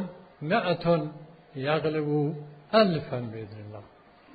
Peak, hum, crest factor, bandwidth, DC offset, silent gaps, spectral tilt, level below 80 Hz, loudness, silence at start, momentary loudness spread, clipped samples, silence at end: -8 dBFS; none; 20 dB; 5 kHz; under 0.1%; none; -9 dB/octave; -62 dBFS; -27 LUFS; 0 s; 20 LU; under 0.1%; 0.5 s